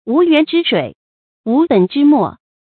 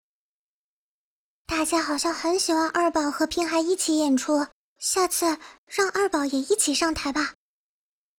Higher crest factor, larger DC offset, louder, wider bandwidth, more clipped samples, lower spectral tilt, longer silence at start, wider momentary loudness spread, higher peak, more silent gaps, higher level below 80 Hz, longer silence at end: about the same, 14 dB vs 18 dB; neither; first, -13 LUFS vs -24 LUFS; second, 4.5 kHz vs 19.5 kHz; neither; first, -9 dB/octave vs -1.5 dB/octave; second, 0.05 s vs 1.5 s; first, 10 LU vs 6 LU; first, 0 dBFS vs -8 dBFS; first, 0.95-1.44 s vs 4.52-4.76 s, 5.58-5.67 s; second, -60 dBFS vs -54 dBFS; second, 0.35 s vs 0.85 s